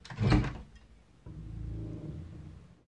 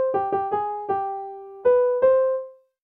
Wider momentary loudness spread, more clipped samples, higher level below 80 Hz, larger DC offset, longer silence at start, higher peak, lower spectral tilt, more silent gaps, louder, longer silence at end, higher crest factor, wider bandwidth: first, 23 LU vs 14 LU; neither; first, -42 dBFS vs -64 dBFS; neither; about the same, 0.05 s vs 0 s; second, -12 dBFS vs -8 dBFS; second, -7.5 dB/octave vs -9 dB/octave; neither; second, -34 LUFS vs -22 LUFS; second, 0.15 s vs 0.3 s; first, 24 dB vs 14 dB; first, 9.2 kHz vs 3.4 kHz